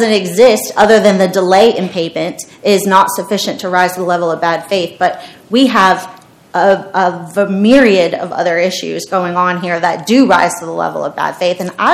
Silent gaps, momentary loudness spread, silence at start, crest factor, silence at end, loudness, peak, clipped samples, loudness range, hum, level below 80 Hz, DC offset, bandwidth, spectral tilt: none; 9 LU; 0 s; 12 dB; 0 s; -12 LUFS; 0 dBFS; 0.9%; 3 LU; none; -52 dBFS; under 0.1%; 16.5 kHz; -4.5 dB/octave